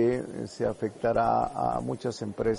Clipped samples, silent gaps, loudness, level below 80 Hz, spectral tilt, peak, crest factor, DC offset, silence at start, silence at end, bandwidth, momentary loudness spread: under 0.1%; none; -29 LUFS; -52 dBFS; -7 dB/octave; -12 dBFS; 16 dB; under 0.1%; 0 s; 0 s; 11.5 kHz; 8 LU